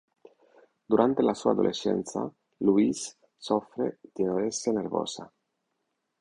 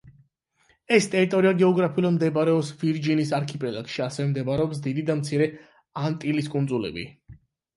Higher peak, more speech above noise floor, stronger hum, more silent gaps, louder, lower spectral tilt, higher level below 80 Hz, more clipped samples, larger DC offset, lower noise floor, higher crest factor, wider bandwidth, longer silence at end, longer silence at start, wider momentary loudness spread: about the same, -6 dBFS vs -4 dBFS; first, 53 dB vs 42 dB; neither; neither; second, -28 LUFS vs -24 LUFS; second, -5 dB/octave vs -6.5 dB/octave; second, -66 dBFS vs -60 dBFS; neither; neither; first, -80 dBFS vs -66 dBFS; about the same, 22 dB vs 20 dB; about the same, 11 kHz vs 11.5 kHz; first, 0.95 s vs 0.45 s; first, 0.9 s vs 0.05 s; about the same, 12 LU vs 10 LU